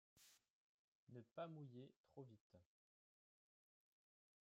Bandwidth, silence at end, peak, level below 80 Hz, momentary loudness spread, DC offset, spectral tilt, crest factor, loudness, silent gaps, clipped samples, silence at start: 7.6 kHz; 1.75 s; -42 dBFS; under -90 dBFS; 9 LU; under 0.1%; -6.5 dB/octave; 22 dB; -60 LUFS; 0.50-1.07 s, 1.96-2.04 s, 2.41-2.50 s; under 0.1%; 0.15 s